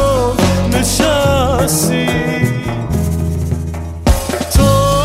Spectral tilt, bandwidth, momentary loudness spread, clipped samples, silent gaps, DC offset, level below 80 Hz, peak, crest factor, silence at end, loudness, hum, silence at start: -5 dB/octave; 16.5 kHz; 7 LU; under 0.1%; none; under 0.1%; -22 dBFS; 0 dBFS; 14 dB; 0 s; -14 LUFS; none; 0 s